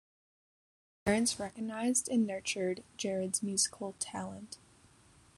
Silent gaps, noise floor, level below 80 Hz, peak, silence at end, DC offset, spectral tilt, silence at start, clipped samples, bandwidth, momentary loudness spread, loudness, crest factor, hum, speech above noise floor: none; -63 dBFS; -66 dBFS; -14 dBFS; 0.8 s; under 0.1%; -3 dB/octave; 1.05 s; under 0.1%; 13 kHz; 12 LU; -34 LUFS; 22 dB; none; 28 dB